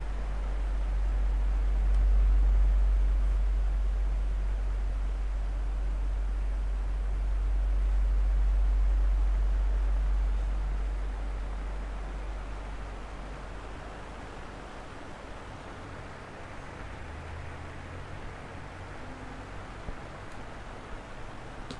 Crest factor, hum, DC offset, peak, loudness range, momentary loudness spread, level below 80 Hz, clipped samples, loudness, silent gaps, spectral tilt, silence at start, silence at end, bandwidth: 12 dB; none; under 0.1%; -18 dBFS; 14 LU; 15 LU; -30 dBFS; under 0.1%; -34 LUFS; none; -7 dB/octave; 0 s; 0 s; 5.6 kHz